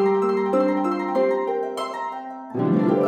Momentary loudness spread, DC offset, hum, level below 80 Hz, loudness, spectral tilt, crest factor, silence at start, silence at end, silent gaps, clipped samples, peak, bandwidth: 10 LU; under 0.1%; none; -76 dBFS; -23 LUFS; -8 dB/octave; 14 dB; 0 s; 0 s; none; under 0.1%; -8 dBFS; 10 kHz